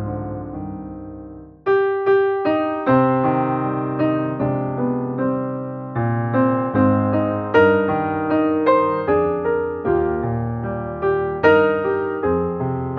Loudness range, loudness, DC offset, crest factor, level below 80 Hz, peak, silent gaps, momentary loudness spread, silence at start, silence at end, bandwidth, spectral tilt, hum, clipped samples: 3 LU; -19 LUFS; under 0.1%; 16 dB; -48 dBFS; -2 dBFS; none; 12 LU; 0 s; 0 s; 5.2 kHz; -7 dB/octave; none; under 0.1%